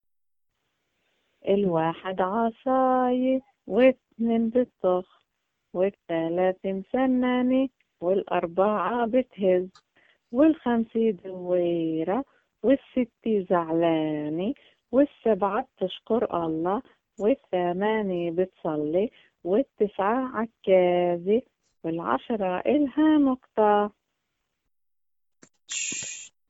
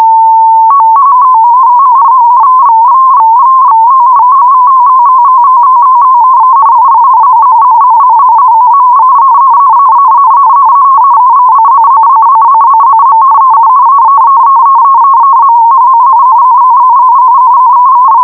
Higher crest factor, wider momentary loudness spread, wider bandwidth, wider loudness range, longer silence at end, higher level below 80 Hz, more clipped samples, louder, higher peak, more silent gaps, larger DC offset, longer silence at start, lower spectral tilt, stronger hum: first, 18 dB vs 4 dB; first, 9 LU vs 0 LU; first, 8 kHz vs 2.5 kHz; first, 3 LU vs 0 LU; first, 0.2 s vs 0 s; about the same, -64 dBFS vs -60 dBFS; second, under 0.1% vs 0.4%; second, -25 LUFS vs -3 LUFS; second, -8 dBFS vs 0 dBFS; neither; neither; first, 1.45 s vs 0 s; about the same, -5.5 dB/octave vs -5.5 dB/octave; neither